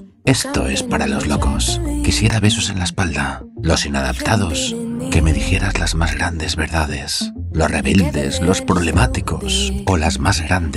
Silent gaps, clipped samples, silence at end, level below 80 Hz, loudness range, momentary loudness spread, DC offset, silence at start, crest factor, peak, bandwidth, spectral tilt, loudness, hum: none; under 0.1%; 0 s; -24 dBFS; 1 LU; 5 LU; under 0.1%; 0 s; 16 dB; -2 dBFS; 15 kHz; -4.5 dB/octave; -18 LUFS; none